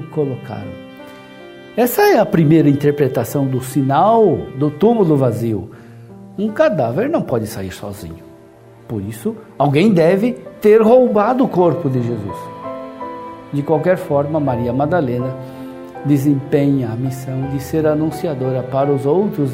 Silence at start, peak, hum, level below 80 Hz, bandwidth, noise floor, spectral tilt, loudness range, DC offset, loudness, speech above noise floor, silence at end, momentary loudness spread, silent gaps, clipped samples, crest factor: 0 s; 0 dBFS; none; -50 dBFS; 16 kHz; -42 dBFS; -7.5 dB/octave; 6 LU; under 0.1%; -16 LUFS; 27 dB; 0 s; 17 LU; none; under 0.1%; 16 dB